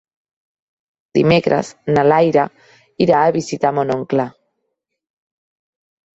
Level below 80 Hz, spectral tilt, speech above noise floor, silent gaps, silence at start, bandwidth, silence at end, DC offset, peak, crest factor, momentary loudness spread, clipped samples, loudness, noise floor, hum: -54 dBFS; -6.5 dB/octave; 59 dB; none; 1.15 s; 8.2 kHz; 1.85 s; under 0.1%; 0 dBFS; 18 dB; 7 LU; under 0.1%; -16 LUFS; -74 dBFS; none